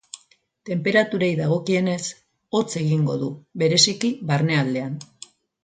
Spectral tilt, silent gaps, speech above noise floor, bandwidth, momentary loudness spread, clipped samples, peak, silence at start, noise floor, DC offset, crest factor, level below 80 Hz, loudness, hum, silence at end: -4.5 dB/octave; none; 39 dB; 9.6 kHz; 16 LU; under 0.1%; -2 dBFS; 0.15 s; -60 dBFS; under 0.1%; 20 dB; -64 dBFS; -22 LUFS; none; 0.6 s